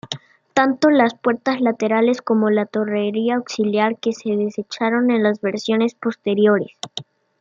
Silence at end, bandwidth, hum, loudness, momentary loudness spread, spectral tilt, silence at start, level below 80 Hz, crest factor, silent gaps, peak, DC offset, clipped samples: 0.4 s; 7.6 kHz; none; -19 LUFS; 8 LU; -5.5 dB/octave; 0.05 s; -70 dBFS; 18 dB; none; -2 dBFS; under 0.1%; under 0.1%